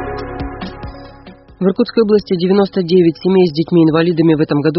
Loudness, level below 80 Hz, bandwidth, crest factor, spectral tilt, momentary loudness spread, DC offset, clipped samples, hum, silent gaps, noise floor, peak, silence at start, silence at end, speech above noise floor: -13 LUFS; -38 dBFS; 6 kHz; 14 dB; -6.5 dB/octave; 14 LU; under 0.1%; under 0.1%; none; none; -38 dBFS; 0 dBFS; 0 s; 0 s; 26 dB